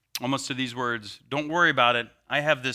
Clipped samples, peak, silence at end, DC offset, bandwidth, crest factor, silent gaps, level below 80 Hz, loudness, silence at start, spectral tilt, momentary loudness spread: under 0.1%; -6 dBFS; 0 s; under 0.1%; 16 kHz; 20 dB; none; -66 dBFS; -25 LUFS; 0.15 s; -3.5 dB/octave; 11 LU